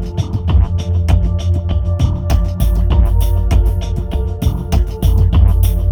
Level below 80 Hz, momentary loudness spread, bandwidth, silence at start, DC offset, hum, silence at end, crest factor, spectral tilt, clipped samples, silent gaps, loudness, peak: -14 dBFS; 6 LU; 19 kHz; 0 s; under 0.1%; none; 0 s; 12 dB; -7.5 dB/octave; under 0.1%; none; -16 LUFS; 0 dBFS